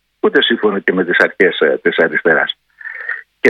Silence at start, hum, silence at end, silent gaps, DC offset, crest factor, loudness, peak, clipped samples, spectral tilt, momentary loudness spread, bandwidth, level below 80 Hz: 0.25 s; none; 0 s; none; under 0.1%; 14 dB; -14 LUFS; 0 dBFS; 0.1%; -5.5 dB/octave; 12 LU; 8 kHz; -62 dBFS